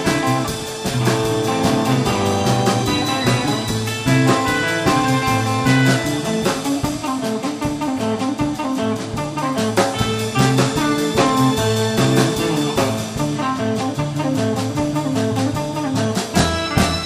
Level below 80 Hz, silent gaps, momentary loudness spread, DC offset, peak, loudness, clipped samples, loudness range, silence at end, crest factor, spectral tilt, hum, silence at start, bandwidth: -40 dBFS; none; 6 LU; under 0.1%; 0 dBFS; -18 LUFS; under 0.1%; 4 LU; 0 s; 18 dB; -5 dB/octave; none; 0 s; 15.5 kHz